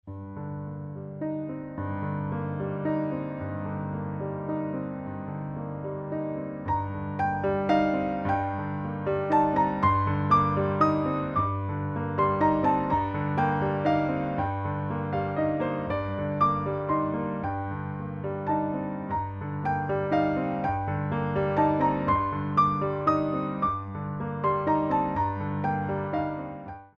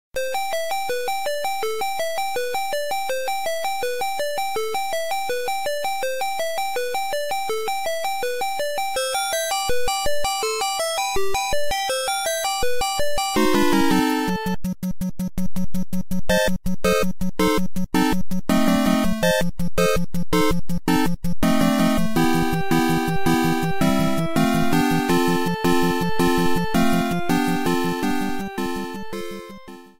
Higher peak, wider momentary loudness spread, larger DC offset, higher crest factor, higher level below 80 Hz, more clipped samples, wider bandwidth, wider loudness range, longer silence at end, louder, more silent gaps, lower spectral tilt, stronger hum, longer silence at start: about the same, -10 dBFS vs -8 dBFS; first, 10 LU vs 7 LU; neither; about the same, 18 dB vs 14 dB; second, -52 dBFS vs -38 dBFS; neither; second, 6.8 kHz vs 16.5 kHz; first, 7 LU vs 4 LU; about the same, 0.1 s vs 0 s; second, -28 LUFS vs -22 LUFS; neither; first, -9.5 dB/octave vs -4.5 dB/octave; neither; about the same, 0.05 s vs 0.1 s